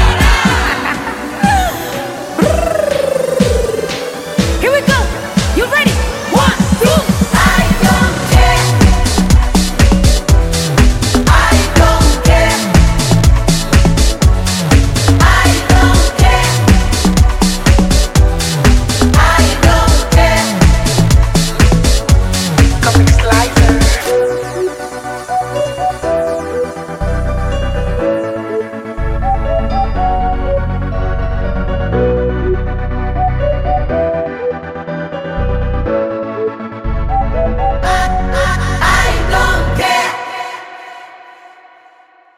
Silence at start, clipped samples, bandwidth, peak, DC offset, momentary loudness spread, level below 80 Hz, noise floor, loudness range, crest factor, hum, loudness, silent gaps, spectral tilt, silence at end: 0 s; under 0.1%; 16 kHz; 0 dBFS; under 0.1%; 10 LU; -16 dBFS; -45 dBFS; 7 LU; 12 dB; none; -12 LUFS; none; -5 dB/octave; 1.2 s